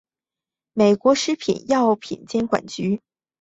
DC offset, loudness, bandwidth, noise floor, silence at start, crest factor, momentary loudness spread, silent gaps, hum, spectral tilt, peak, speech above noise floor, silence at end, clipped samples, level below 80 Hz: under 0.1%; -21 LUFS; 8.2 kHz; -90 dBFS; 0.75 s; 18 dB; 9 LU; none; none; -5 dB/octave; -4 dBFS; 70 dB; 0.45 s; under 0.1%; -60 dBFS